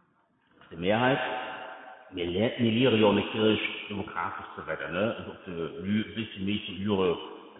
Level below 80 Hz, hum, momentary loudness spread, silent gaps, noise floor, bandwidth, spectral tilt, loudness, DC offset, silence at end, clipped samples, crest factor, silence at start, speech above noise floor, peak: -62 dBFS; none; 15 LU; none; -68 dBFS; 4 kHz; -10 dB/octave; -29 LUFS; under 0.1%; 0 s; under 0.1%; 20 dB; 0.7 s; 40 dB; -10 dBFS